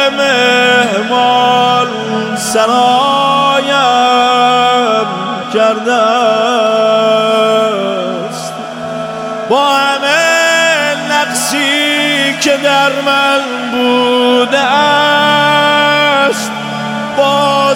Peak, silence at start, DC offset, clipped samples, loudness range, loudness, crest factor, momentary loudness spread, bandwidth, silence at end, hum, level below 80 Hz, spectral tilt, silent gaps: 0 dBFS; 0 s; under 0.1%; under 0.1%; 3 LU; -10 LUFS; 10 dB; 8 LU; 17.5 kHz; 0 s; none; -60 dBFS; -3 dB/octave; none